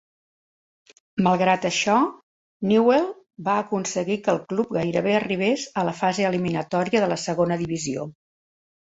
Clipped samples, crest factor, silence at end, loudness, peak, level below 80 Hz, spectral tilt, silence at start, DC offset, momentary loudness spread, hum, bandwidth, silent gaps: under 0.1%; 18 dB; 0.9 s; -23 LUFS; -6 dBFS; -62 dBFS; -5 dB/octave; 1.15 s; under 0.1%; 8 LU; none; 8 kHz; 2.23-2.60 s